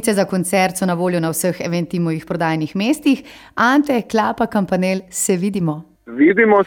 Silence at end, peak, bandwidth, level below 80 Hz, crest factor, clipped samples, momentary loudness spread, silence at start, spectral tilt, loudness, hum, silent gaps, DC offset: 0 s; -2 dBFS; 17.5 kHz; -54 dBFS; 16 dB; under 0.1%; 7 LU; 0 s; -5 dB/octave; -18 LUFS; none; none; under 0.1%